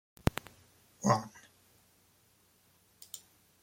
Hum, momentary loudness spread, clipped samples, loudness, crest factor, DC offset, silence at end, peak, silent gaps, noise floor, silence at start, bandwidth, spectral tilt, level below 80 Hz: none; 26 LU; under 0.1%; -35 LUFS; 30 dB; under 0.1%; 0.45 s; -8 dBFS; none; -68 dBFS; 1 s; 16.5 kHz; -5.5 dB/octave; -56 dBFS